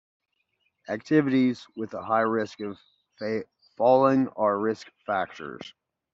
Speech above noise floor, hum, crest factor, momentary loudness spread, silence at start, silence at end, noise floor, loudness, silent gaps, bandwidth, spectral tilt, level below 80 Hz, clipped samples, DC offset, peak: 49 dB; none; 18 dB; 17 LU; 0.9 s; 0.45 s; -74 dBFS; -26 LUFS; none; 7.6 kHz; -5.5 dB/octave; -72 dBFS; under 0.1%; under 0.1%; -8 dBFS